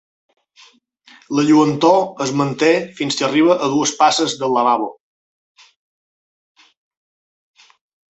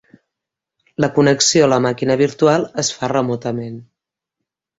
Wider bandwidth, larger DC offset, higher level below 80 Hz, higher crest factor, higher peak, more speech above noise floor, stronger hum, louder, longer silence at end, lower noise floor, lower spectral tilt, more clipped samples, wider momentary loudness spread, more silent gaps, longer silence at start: about the same, 8.2 kHz vs 8 kHz; neither; second, -64 dBFS vs -56 dBFS; about the same, 18 dB vs 16 dB; about the same, -2 dBFS vs -2 dBFS; first, over 74 dB vs 67 dB; neither; about the same, -16 LUFS vs -16 LUFS; first, 3.3 s vs 0.95 s; first, under -90 dBFS vs -83 dBFS; about the same, -4.5 dB/octave vs -4 dB/octave; neither; second, 7 LU vs 14 LU; neither; first, 1.3 s vs 1 s